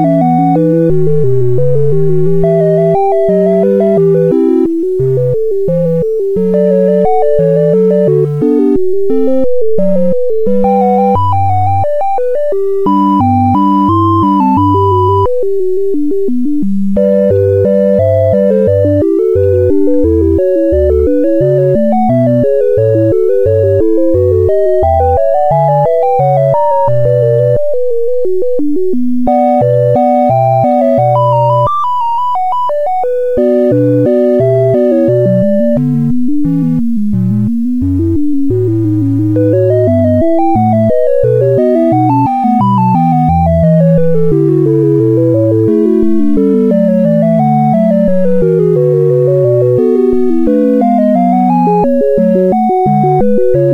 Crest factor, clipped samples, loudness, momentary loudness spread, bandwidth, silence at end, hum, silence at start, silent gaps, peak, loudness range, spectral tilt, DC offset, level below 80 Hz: 8 dB; under 0.1%; -10 LUFS; 4 LU; 7.4 kHz; 0 s; none; 0 s; none; 0 dBFS; 2 LU; -10.5 dB/octave; under 0.1%; -32 dBFS